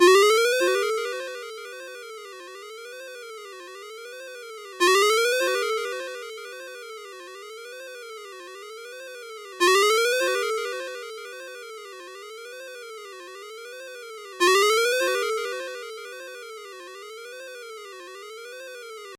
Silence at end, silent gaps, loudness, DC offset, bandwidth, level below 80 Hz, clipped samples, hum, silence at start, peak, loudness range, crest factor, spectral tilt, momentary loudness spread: 0.05 s; none; -22 LUFS; under 0.1%; 16.5 kHz; -86 dBFS; under 0.1%; none; 0 s; -4 dBFS; 14 LU; 22 dB; 0.5 dB/octave; 21 LU